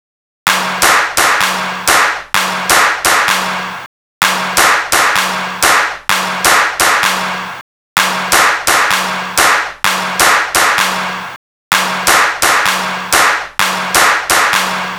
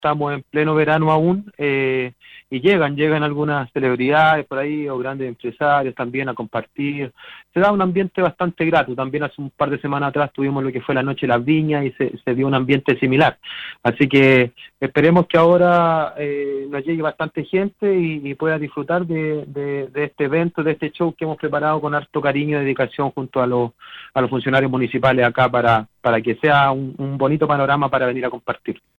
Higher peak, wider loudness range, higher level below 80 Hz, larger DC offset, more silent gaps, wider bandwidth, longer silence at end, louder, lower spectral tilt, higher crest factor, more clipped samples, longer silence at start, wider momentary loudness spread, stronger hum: about the same, 0 dBFS vs -2 dBFS; second, 1 LU vs 6 LU; first, -44 dBFS vs -54 dBFS; neither; first, 3.86-4.21 s, 7.61-7.96 s, 11.36-11.71 s vs none; first, over 20 kHz vs 7.6 kHz; second, 0 s vs 0.25 s; first, -11 LUFS vs -19 LUFS; second, -0.5 dB/octave vs -8.5 dB/octave; second, 12 dB vs 18 dB; first, 0.4% vs under 0.1%; first, 0.45 s vs 0 s; second, 7 LU vs 10 LU; neither